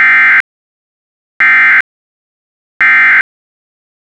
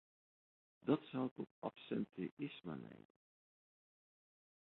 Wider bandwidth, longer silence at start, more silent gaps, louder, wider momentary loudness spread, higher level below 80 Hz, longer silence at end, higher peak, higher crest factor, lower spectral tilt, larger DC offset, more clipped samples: first, 10.5 kHz vs 4.2 kHz; second, 0 s vs 0.85 s; first, 0.40-1.40 s, 1.81-2.80 s vs 1.31-1.36 s, 1.51-1.62 s, 2.31-2.37 s; first, -6 LUFS vs -45 LUFS; first, 17 LU vs 12 LU; first, -60 dBFS vs -84 dBFS; second, 0.95 s vs 1.7 s; first, -4 dBFS vs -22 dBFS; second, 8 dB vs 24 dB; second, -1.5 dB/octave vs -6.5 dB/octave; neither; neither